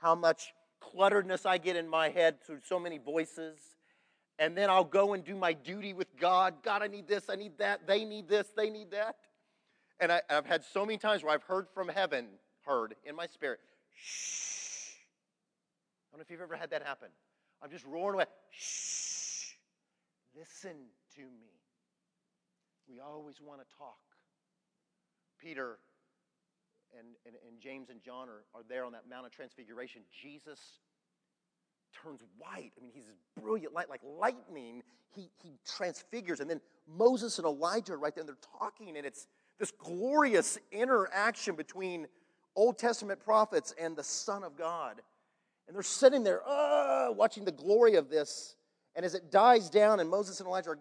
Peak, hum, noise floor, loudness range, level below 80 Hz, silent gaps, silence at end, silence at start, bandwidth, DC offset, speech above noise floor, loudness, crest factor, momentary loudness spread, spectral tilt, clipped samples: -10 dBFS; none; -87 dBFS; 22 LU; under -90 dBFS; none; 0 s; 0 s; 11 kHz; under 0.1%; 54 dB; -32 LUFS; 24 dB; 23 LU; -3 dB/octave; under 0.1%